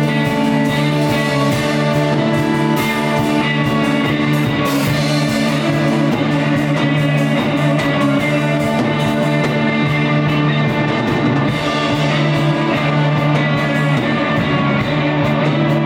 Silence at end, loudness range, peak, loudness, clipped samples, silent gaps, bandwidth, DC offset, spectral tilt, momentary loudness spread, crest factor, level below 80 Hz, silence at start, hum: 0 s; 0 LU; -4 dBFS; -15 LUFS; under 0.1%; none; 17.5 kHz; under 0.1%; -6.5 dB/octave; 1 LU; 12 dB; -44 dBFS; 0 s; none